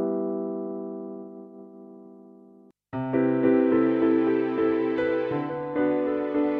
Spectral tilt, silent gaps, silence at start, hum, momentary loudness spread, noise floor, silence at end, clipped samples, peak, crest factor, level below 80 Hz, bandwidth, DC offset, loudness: -10 dB/octave; none; 0 s; none; 20 LU; -54 dBFS; 0 s; under 0.1%; -10 dBFS; 16 dB; -64 dBFS; 4.7 kHz; under 0.1%; -25 LUFS